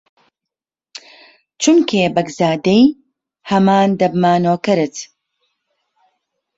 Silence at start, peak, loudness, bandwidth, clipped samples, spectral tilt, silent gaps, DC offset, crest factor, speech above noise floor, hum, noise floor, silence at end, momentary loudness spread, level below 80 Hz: 1.6 s; -2 dBFS; -15 LUFS; 8 kHz; under 0.1%; -5.5 dB/octave; none; under 0.1%; 16 dB; 72 dB; none; -85 dBFS; 1.55 s; 24 LU; -58 dBFS